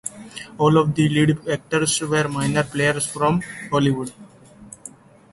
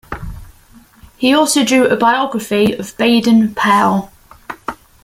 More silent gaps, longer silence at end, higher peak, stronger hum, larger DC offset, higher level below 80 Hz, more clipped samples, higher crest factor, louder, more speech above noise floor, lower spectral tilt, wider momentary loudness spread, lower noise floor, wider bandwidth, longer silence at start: neither; first, 0.45 s vs 0.3 s; about the same, -4 dBFS vs -2 dBFS; neither; neither; second, -52 dBFS vs -42 dBFS; neither; about the same, 16 dB vs 14 dB; second, -20 LUFS vs -13 LUFS; second, 24 dB vs 32 dB; about the same, -5 dB/octave vs -4 dB/octave; about the same, 19 LU vs 17 LU; about the same, -44 dBFS vs -45 dBFS; second, 12 kHz vs 16 kHz; about the same, 0.05 s vs 0.1 s